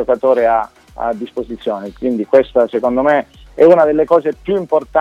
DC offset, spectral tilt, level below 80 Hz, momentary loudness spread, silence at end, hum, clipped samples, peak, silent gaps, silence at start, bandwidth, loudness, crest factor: under 0.1%; -7.5 dB/octave; -44 dBFS; 12 LU; 0 s; none; under 0.1%; 0 dBFS; none; 0 s; 7.4 kHz; -14 LUFS; 14 dB